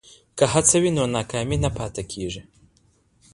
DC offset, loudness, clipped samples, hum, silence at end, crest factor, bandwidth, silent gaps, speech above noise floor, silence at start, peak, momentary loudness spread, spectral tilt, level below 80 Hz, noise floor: under 0.1%; -22 LUFS; under 0.1%; none; 0.9 s; 20 dB; 11.5 kHz; none; 39 dB; 0.35 s; -4 dBFS; 15 LU; -4 dB/octave; -42 dBFS; -61 dBFS